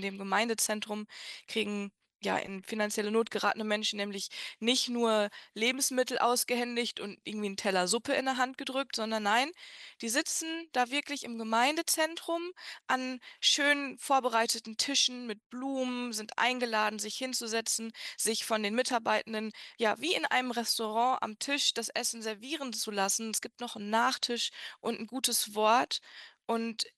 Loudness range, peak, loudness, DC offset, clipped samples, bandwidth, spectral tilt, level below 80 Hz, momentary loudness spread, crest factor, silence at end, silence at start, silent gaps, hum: 3 LU; -12 dBFS; -31 LUFS; under 0.1%; under 0.1%; 13 kHz; -1.5 dB/octave; -82 dBFS; 10 LU; 20 dB; 0.1 s; 0 s; 15.46-15.50 s; none